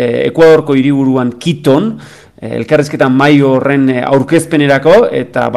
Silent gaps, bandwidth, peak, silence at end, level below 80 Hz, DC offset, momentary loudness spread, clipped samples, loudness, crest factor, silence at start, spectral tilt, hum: none; 12.5 kHz; 0 dBFS; 0 s; -48 dBFS; under 0.1%; 8 LU; under 0.1%; -10 LUFS; 10 dB; 0 s; -6.5 dB/octave; none